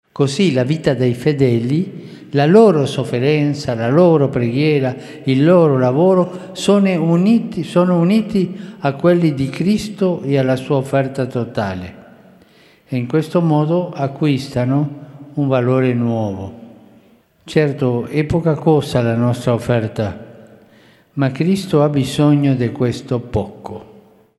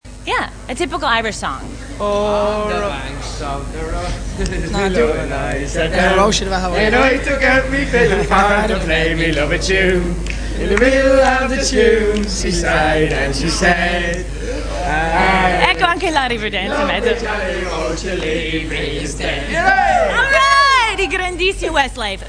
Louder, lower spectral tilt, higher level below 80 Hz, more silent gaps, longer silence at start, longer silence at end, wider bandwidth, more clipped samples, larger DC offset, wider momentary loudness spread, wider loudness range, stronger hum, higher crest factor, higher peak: about the same, -16 LUFS vs -16 LUFS; first, -7.5 dB/octave vs -4 dB/octave; second, -48 dBFS vs -26 dBFS; neither; about the same, 0.15 s vs 0.05 s; first, 0.55 s vs 0 s; first, 12.5 kHz vs 10.5 kHz; neither; neither; about the same, 11 LU vs 11 LU; about the same, 5 LU vs 6 LU; neither; about the same, 16 dB vs 16 dB; about the same, 0 dBFS vs 0 dBFS